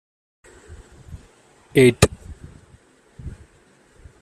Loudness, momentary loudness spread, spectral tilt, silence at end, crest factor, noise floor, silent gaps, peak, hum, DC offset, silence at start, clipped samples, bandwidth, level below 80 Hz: -17 LUFS; 28 LU; -5 dB/octave; 0.9 s; 24 dB; -55 dBFS; none; 0 dBFS; none; under 0.1%; 1.1 s; under 0.1%; 14.5 kHz; -42 dBFS